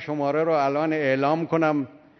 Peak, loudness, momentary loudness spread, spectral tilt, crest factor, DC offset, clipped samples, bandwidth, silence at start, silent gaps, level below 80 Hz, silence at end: -8 dBFS; -23 LUFS; 3 LU; -7.5 dB/octave; 14 dB; under 0.1%; under 0.1%; 6.4 kHz; 0 s; none; -74 dBFS; 0.25 s